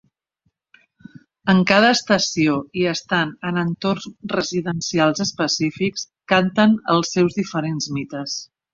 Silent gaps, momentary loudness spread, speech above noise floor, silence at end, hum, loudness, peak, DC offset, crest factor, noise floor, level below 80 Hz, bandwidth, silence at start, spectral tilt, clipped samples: none; 11 LU; 51 dB; 0.3 s; none; -20 LUFS; 0 dBFS; under 0.1%; 20 dB; -71 dBFS; -58 dBFS; 7.6 kHz; 1.45 s; -4.5 dB/octave; under 0.1%